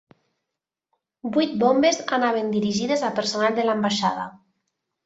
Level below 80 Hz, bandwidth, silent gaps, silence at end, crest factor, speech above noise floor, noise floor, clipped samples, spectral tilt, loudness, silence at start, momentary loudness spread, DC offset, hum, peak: -66 dBFS; 8 kHz; none; 0.7 s; 16 dB; 63 dB; -85 dBFS; under 0.1%; -4 dB/octave; -22 LUFS; 1.25 s; 7 LU; under 0.1%; none; -6 dBFS